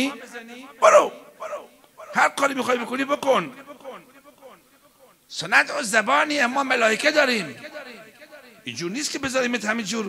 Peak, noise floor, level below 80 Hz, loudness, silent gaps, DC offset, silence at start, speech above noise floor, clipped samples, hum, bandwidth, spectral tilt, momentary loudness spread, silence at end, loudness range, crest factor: -2 dBFS; -55 dBFS; -68 dBFS; -21 LUFS; none; under 0.1%; 0 s; 33 dB; under 0.1%; none; 16 kHz; -2.5 dB/octave; 20 LU; 0 s; 4 LU; 22 dB